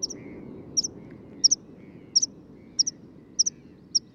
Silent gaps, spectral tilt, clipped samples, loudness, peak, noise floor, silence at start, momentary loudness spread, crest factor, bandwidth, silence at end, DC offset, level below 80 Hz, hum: none; 0 dB/octave; under 0.1%; -25 LUFS; -8 dBFS; -48 dBFS; 0 s; 21 LU; 22 dB; 16 kHz; 0.15 s; under 0.1%; -64 dBFS; none